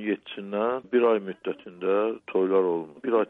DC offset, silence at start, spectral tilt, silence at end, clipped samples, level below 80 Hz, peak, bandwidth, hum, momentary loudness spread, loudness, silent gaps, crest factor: under 0.1%; 0 s; -8.5 dB/octave; 0.05 s; under 0.1%; -76 dBFS; -12 dBFS; 3.9 kHz; none; 10 LU; -26 LUFS; none; 14 dB